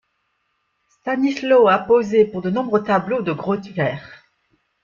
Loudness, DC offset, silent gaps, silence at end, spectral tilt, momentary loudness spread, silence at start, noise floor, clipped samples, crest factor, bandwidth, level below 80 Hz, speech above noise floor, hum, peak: -18 LUFS; under 0.1%; none; 0.7 s; -7 dB/octave; 10 LU; 1.05 s; -70 dBFS; under 0.1%; 16 dB; 7.2 kHz; -60 dBFS; 52 dB; none; -4 dBFS